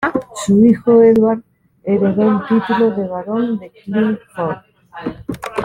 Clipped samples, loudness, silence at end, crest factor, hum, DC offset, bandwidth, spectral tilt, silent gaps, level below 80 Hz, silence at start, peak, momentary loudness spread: under 0.1%; -15 LUFS; 0 s; 14 dB; none; under 0.1%; 11.5 kHz; -7 dB/octave; none; -50 dBFS; 0 s; -2 dBFS; 16 LU